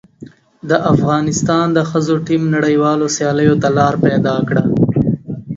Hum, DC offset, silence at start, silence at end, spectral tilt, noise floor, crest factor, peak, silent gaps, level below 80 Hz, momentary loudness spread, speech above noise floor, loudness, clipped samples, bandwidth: none; under 0.1%; 0.2 s; 0 s; -6 dB/octave; -38 dBFS; 14 dB; 0 dBFS; none; -44 dBFS; 4 LU; 25 dB; -14 LUFS; under 0.1%; 7.8 kHz